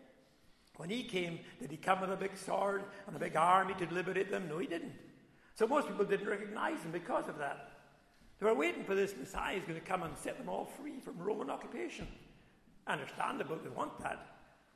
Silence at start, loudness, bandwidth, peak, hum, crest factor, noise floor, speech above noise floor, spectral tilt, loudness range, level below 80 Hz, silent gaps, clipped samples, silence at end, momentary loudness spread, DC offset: 0 s; -38 LUFS; 13.5 kHz; -14 dBFS; none; 24 dB; -66 dBFS; 29 dB; -5 dB/octave; 7 LU; -66 dBFS; none; under 0.1%; 0.3 s; 14 LU; under 0.1%